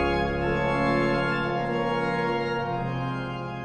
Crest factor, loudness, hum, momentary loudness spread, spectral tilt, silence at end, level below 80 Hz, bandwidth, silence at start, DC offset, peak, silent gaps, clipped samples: 14 dB; -26 LUFS; none; 6 LU; -7 dB/octave; 0 s; -42 dBFS; 9 kHz; 0 s; under 0.1%; -12 dBFS; none; under 0.1%